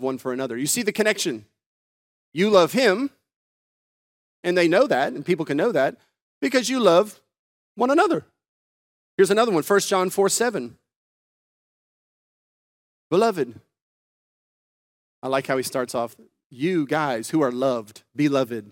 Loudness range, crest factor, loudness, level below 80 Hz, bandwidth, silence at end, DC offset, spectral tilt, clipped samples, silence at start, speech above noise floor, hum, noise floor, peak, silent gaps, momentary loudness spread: 8 LU; 22 dB; -22 LUFS; -76 dBFS; 17 kHz; 0.05 s; under 0.1%; -4 dB/octave; under 0.1%; 0 s; over 69 dB; none; under -90 dBFS; -2 dBFS; 1.66-2.32 s, 3.36-4.43 s, 6.22-6.41 s, 7.39-7.75 s, 8.48-9.18 s, 10.96-13.10 s, 13.82-15.22 s, 16.46-16.50 s; 12 LU